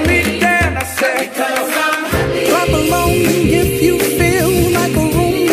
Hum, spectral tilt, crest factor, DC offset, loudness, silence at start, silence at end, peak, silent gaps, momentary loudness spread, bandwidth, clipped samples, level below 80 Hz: none; -4.5 dB/octave; 14 dB; under 0.1%; -14 LUFS; 0 s; 0 s; 0 dBFS; none; 4 LU; 15.5 kHz; under 0.1%; -30 dBFS